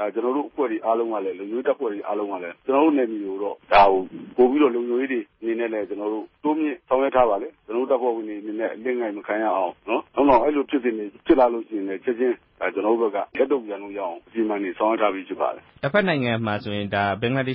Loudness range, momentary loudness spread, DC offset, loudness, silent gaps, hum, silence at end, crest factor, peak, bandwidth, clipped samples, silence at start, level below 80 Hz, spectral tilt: 4 LU; 10 LU; under 0.1%; -23 LUFS; none; none; 0 s; 20 dB; -4 dBFS; 5.8 kHz; under 0.1%; 0 s; -54 dBFS; -11 dB/octave